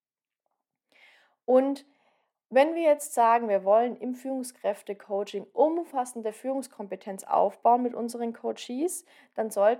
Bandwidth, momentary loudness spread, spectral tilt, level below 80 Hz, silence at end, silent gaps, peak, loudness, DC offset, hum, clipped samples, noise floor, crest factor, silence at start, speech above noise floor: 16.5 kHz; 14 LU; -4 dB/octave; under -90 dBFS; 0 s; none; -10 dBFS; -27 LUFS; under 0.1%; none; under 0.1%; -85 dBFS; 18 dB; 1.5 s; 59 dB